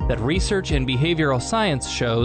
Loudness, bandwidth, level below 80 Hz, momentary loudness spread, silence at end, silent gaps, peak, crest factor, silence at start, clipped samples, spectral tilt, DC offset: -21 LUFS; 9.2 kHz; -30 dBFS; 3 LU; 0 s; none; -8 dBFS; 14 dB; 0 s; under 0.1%; -5 dB/octave; under 0.1%